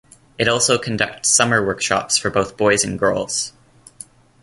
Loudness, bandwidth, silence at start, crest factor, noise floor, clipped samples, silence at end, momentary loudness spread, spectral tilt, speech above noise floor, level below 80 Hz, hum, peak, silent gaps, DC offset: -17 LUFS; 11.5 kHz; 0.4 s; 18 dB; -43 dBFS; under 0.1%; 0.95 s; 7 LU; -2.5 dB/octave; 25 dB; -50 dBFS; none; -2 dBFS; none; under 0.1%